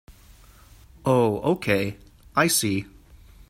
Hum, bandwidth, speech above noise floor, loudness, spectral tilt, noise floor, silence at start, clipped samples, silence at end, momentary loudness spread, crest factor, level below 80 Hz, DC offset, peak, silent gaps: none; 16 kHz; 28 dB; -23 LUFS; -4 dB/octave; -51 dBFS; 0.1 s; under 0.1%; 0.6 s; 10 LU; 20 dB; -52 dBFS; under 0.1%; -6 dBFS; none